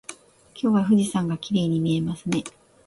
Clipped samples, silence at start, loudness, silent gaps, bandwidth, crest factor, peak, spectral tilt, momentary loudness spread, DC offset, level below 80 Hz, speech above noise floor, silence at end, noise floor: under 0.1%; 0.1 s; -23 LUFS; none; 11.5 kHz; 16 dB; -8 dBFS; -6.5 dB/octave; 9 LU; under 0.1%; -58 dBFS; 25 dB; 0.35 s; -48 dBFS